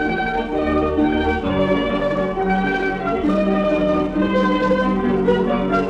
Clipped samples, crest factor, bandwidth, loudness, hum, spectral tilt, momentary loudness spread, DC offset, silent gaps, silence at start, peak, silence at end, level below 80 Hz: under 0.1%; 14 dB; 8 kHz; -19 LUFS; none; -7.5 dB/octave; 3 LU; under 0.1%; none; 0 s; -6 dBFS; 0 s; -36 dBFS